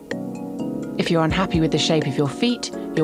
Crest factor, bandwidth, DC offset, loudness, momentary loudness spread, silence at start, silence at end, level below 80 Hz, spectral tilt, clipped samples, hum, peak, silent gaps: 16 dB; 14 kHz; under 0.1%; -22 LUFS; 10 LU; 0 s; 0 s; -42 dBFS; -5.5 dB/octave; under 0.1%; none; -6 dBFS; none